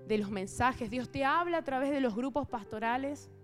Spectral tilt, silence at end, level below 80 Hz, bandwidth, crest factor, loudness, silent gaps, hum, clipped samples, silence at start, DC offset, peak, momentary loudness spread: -5.5 dB/octave; 0 s; -58 dBFS; 14.5 kHz; 18 dB; -33 LUFS; none; none; under 0.1%; 0 s; under 0.1%; -14 dBFS; 7 LU